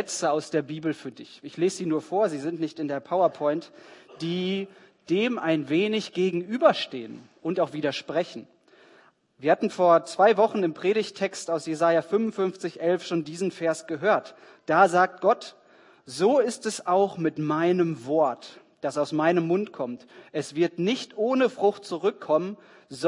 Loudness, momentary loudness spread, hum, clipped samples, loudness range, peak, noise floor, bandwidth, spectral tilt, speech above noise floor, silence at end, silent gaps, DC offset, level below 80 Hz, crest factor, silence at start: -25 LUFS; 13 LU; none; under 0.1%; 4 LU; -6 dBFS; -58 dBFS; 11 kHz; -5 dB/octave; 33 dB; 0 s; none; under 0.1%; -78 dBFS; 20 dB; 0 s